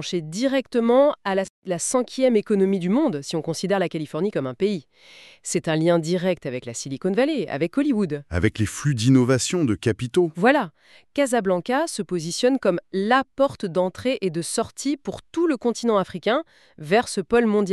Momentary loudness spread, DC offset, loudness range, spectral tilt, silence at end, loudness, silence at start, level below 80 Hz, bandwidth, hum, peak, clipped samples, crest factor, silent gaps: 8 LU; under 0.1%; 3 LU; -5.5 dB/octave; 0 s; -22 LUFS; 0 s; -52 dBFS; 13 kHz; none; -4 dBFS; under 0.1%; 18 dB; 1.50-1.62 s